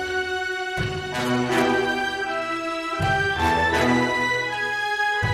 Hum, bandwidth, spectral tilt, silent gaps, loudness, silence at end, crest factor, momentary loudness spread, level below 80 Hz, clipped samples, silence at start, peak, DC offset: none; 16 kHz; -4.5 dB/octave; none; -23 LUFS; 0 s; 16 dB; 6 LU; -44 dBFS; under 0.1%; 0 s; -6 dBFS; under 0.1%